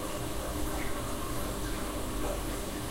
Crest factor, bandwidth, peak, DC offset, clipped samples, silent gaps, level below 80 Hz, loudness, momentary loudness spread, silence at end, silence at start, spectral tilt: 12 dB; 16 kHz; -22 dBFS; under 0.1%; under 0.1%; none; -40 dBFS; -36 LUFS; 1 LU; 0 s; 0 s; -4 dB/octave